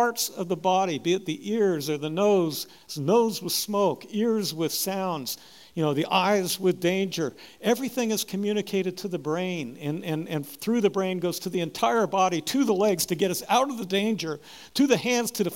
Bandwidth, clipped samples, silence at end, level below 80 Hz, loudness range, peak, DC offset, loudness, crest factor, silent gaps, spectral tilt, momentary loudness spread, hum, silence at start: 16.5 kHz; under 0.1%; 0 s; -70 dBFS; 3 LU; -8 dBFS; 0.1%; -26 LUFS; 18 dB; none; -4.5 dB/octave; 9 LU; none; 0 s